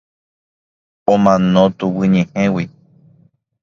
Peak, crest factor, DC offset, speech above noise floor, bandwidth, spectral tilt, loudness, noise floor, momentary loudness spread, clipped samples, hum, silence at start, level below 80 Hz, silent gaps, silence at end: 0 dBFS; 16 dB; under 0.1%; 40 dB; 7 kHz; -7.5 dB/octave; -15 LUFS; -54 dBFS; 10 LU; under 0.1%; none; 1.1 s; -50 dBFS; none; 0.95 s